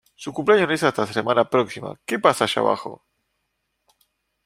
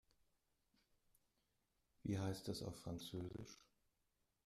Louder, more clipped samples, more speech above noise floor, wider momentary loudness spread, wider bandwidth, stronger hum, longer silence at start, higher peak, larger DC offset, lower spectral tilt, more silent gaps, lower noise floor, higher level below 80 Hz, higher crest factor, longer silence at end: first, -21 LUFS vs -49 LUFS; neither; first, 54 dB vs 39 dB; about the same, 11 LU vs 12 LU; about the same, 15.5 kHz vs 14.5 kHz; neither; second, 0.2 s vs 2.05 s; first, -2 dBFS vs -34 dBFS; neither; second, -4.5 dB/octave vs -6 dB/octave; neither; second, -75 dBFS vs -86 dBFS; first, -64 dBFS vs -72 dBFS; about the same, 22 dB vs 18 dB; first, 1.5 s vs 0.85 s